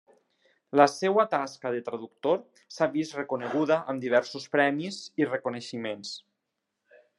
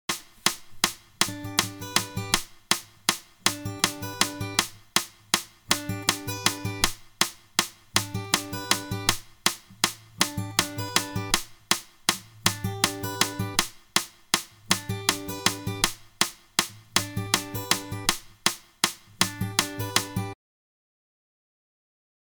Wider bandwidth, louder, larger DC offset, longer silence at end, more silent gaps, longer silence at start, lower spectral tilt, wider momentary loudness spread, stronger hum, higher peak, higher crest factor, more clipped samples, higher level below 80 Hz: second, 11.5 kHz vs 19.5 kHz; about the same, -28 LUFS vs -26 LUFS; neither; second, 1 s vs 2 s; neither; first, 0.75 s vs 0.1 s; first, -5 dB/octave vs -2 dB/octave; first, 12 LU vs 3 LU; neither; about the same, -4 dBFS vs -2 dBFS; about the same, 24 dB vs 28 dB; neither; second, -82 dBFS vs -50 dBFS